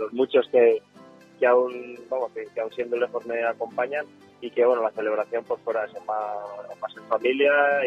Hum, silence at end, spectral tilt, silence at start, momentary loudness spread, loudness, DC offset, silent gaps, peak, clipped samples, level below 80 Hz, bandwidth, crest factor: none; 0 s; -5.5 dB/octave; 0 s; 15 LU; -24 LUFS; under 0.1%; none; -6 dBFS; under 0.1%; -78 dBFS; 6.2 kHz; 18 dB